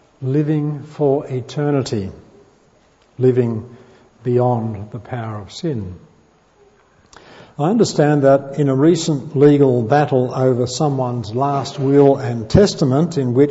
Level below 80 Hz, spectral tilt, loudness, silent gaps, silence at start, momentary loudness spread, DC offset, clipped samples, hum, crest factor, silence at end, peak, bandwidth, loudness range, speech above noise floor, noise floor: -46 dBFS; -7 dB/octave; -17 LUFS; none; 0.2 s; 14 LU; under 0.1%; under 0.1%; none; 16 dB; 0 s; -2 dBFS; 8 kHz; 9 LU; 38 dB; -54 dBFS